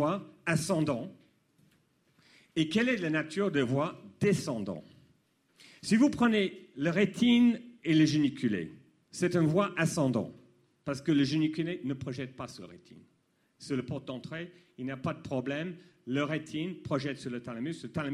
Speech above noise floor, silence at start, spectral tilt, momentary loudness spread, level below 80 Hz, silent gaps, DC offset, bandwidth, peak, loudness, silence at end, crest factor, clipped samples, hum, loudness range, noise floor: 42 dB; 0 s; -6 dB/octave; 16 LU; -66 dBFS; none; under 0.1%; 13 kHz; -14 dBFS; -31 LUFS; 0 s; 18 dB; under 0.1%; none; 11 LU; -72 dBFS